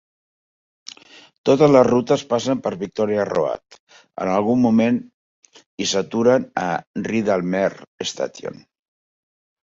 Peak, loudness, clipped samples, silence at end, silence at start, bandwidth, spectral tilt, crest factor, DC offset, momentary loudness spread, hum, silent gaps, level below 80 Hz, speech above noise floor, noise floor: -2 dBFS; -20 LUFS; under 0.1%; 1.2 s; 1.45 s; 7.8 kHz; -5.5 dB/octave; 18 dB; under 0.1%; 14 LU; none; 3.80-3.87 s, 5.14-5.43 s, 5.66-5.77 s, 6.87-6.94 s, 7.87-7.98 s; -58 dBFS; 27 dB; -46 dBFS